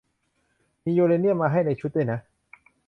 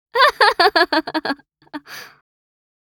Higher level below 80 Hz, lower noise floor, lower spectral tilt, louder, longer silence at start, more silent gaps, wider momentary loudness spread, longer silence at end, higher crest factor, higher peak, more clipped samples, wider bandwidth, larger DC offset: about the same, -62 dBFS vs -60 dBFS; first, -71 dBFS vs -37 dBFS; first, -11 dB/octave vs -2 dB/octave; second, -24 LUFS vs -16 LUFS; first, 0.85 s vs 0.15 s; neither; second, 10 LU vs 23 LU; about the same, 0.65 s vs 0.75 s; about the same, 16 dB vs 20 dB; second, -10 dBFS vs 0 dBFS; neither; second, 5.6 kHz vs over 20 kHz; neither